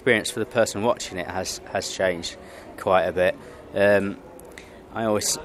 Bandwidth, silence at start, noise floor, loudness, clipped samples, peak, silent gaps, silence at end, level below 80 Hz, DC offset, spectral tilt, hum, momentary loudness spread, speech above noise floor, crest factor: 15 kHz; 0 s; -43 dBFS; -24 LUFS; under 0.1%; -4 dBFS; none; 0 s; -54 dBFS; under 0.1%; -3.5 dB/octave; none; 21 LU; 19 dB; 20 dB